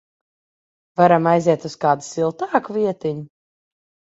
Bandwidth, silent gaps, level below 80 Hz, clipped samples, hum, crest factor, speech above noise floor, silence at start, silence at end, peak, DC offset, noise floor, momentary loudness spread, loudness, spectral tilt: 8 kHz; none; -64 dBFS; under 0.1%; none; 20 dB; over 72 dB; 1 s; 0.9 s; 0 dBFS; under 0.1%; under -90 dBFS; 12 LU; -19 LUFS; -6.5 dB/octave